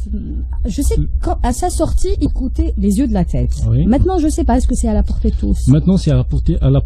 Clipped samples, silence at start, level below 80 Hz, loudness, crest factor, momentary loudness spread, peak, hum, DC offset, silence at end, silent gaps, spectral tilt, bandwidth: under 0.1%; 0 s; -18 dBFS; -16 LUFS; 14 dB; 6 LU; 0 dBFS; none; under 0.1%; 0 s; none; -7.5 dB/octave; 13.5 kHz